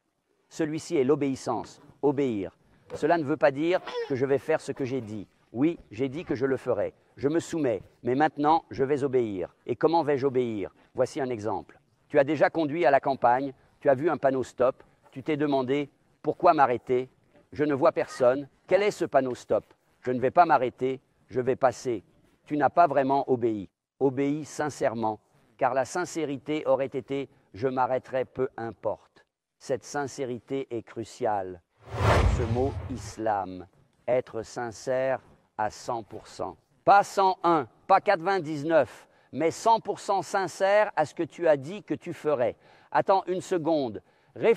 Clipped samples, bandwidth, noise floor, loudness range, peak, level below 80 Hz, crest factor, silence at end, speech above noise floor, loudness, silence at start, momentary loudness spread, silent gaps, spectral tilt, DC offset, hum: under 0.1%; 13.5 kHz; -73 dBFS; 5 LU; -6 dBFS; -48 dBFS; 20 dB; 0 s; 46 dB; -27 LUFS; 0.55 s; 13 LU; none; -6 dB/octave; under 0.1%; none